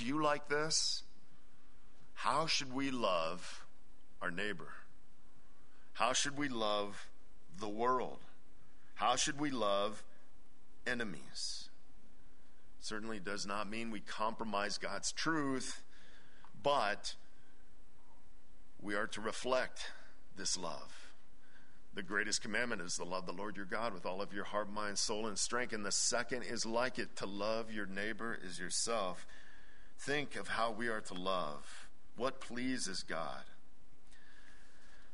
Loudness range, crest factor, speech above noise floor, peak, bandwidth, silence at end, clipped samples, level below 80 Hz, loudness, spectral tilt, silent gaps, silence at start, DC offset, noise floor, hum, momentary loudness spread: 5 LU; 24 dB; 28 dB; -16 dBFS; 10.5 kHz; 0.1 s; under 0.1%; -64 dBFS; -38 LUFS; -2.5 dB/octave; none; 0 s; 1%; -66 dBFS; none; 16 LU